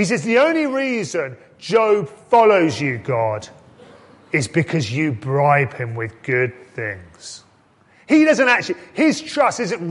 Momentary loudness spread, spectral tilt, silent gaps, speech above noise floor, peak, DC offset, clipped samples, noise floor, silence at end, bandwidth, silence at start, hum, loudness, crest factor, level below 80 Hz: 14 LU; -5.5 dB/octave; none; 36 dB; -2 dBFS; under 0.1%; under 0.1%; -54 dBFS; 0 s; 11.5 kHz; 0 s; none; -18 LUFS; 18 dB; -56 dBFS